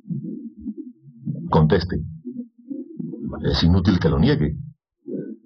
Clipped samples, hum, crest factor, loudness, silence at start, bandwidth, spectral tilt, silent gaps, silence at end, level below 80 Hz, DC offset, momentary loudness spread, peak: under 0.1%; none; 18 dB; -21 LUFS; 0.05 s; 6.4 kHz; -8 dB/octave; none; 0.1 s; -38 dBFS; under 0.1%; 18 LU; -4 dBFS